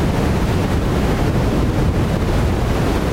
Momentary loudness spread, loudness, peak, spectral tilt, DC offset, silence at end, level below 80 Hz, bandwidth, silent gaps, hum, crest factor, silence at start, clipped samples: 1 LU; -18 LUFS; -6 dBFS; -7 dB/octave; under 0.1%; 0 s; -22 dBFS; 16 kHz; none; none; 10 dB; 0 s; under 0.1%